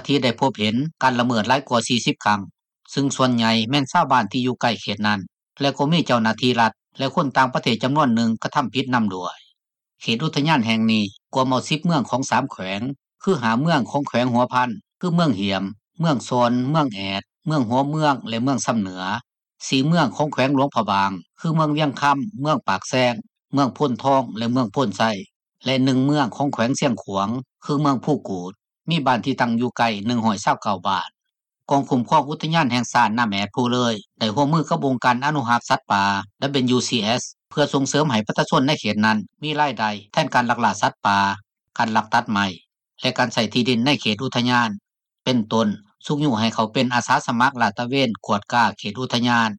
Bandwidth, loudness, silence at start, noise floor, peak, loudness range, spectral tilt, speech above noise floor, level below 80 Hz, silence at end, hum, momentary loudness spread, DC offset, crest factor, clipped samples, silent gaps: 10.5 kHz; -21 LUFS; 0 s; -81 dBFS; -4 dBFS; 2 LU; -5 dB/octave; 61 dB; -64 dBFS; 0 s; none; 7 LU; under 0.1%; 16 dB; under 0.1%; 25.36-25.40 s